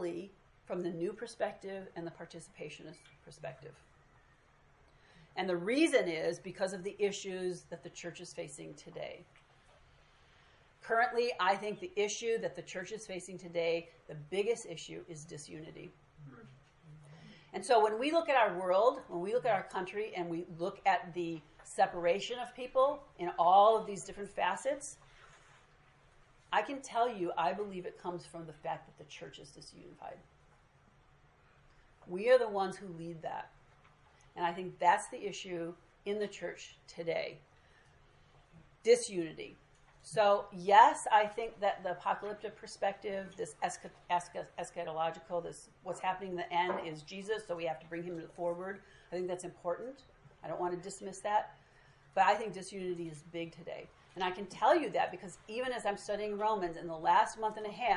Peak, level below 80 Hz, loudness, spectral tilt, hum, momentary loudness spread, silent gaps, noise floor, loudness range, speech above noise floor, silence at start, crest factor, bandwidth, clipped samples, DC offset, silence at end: -10 dBFS; -70 dBFS; -35 LUFS; -4 dB/octave; none; 19 LU; none; -66 dBFS; 12 LU; 31 dB; 0 s; 26 dB; 11.5 kHz; under 0.1%; under 0.1%; 0 s